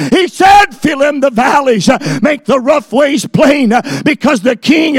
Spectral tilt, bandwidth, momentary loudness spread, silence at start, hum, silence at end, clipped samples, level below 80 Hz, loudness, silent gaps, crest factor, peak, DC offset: -5 dB/octave; 16.5 kHz; 6 LU; 0 s; none; 0 s; 0.6%; -42 dBFS; -10 LUFS; none; 10 dB; 0 dBFS; under 0.1%